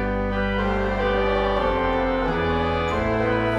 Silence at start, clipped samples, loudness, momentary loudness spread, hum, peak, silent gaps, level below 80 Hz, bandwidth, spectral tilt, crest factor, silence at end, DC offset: 0 s; under 0.1%; -22 LUFS; 2 LU; none; -10 dBFS; none; -32 dBFS; 9.2 kHz; -7 dB/octave; 12 dB; 0 s; under 0.1%